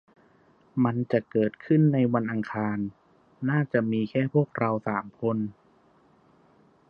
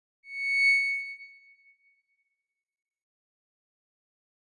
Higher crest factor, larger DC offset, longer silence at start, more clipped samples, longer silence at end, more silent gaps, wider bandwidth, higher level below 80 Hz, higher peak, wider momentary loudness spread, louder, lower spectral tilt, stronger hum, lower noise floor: about the same, 18 dB vs 18 dB; neither; first, 0.75 s vs 0.25 s; neither; second, 1.4 s vs 3.15 s; neither; second, 5.4 kHz vs 9.4 kHz; first, -68 dBFS vs under -90 dBFS; first, -10 dBFS vs -16 dBFS; second, 10 LU vs 19 LU; second, -27 LUFS vs -24 LUFS; first, -10.5 dB/octave vs 5.5 dB/octave; neither; second, -61 dBFS vs -86 dBFS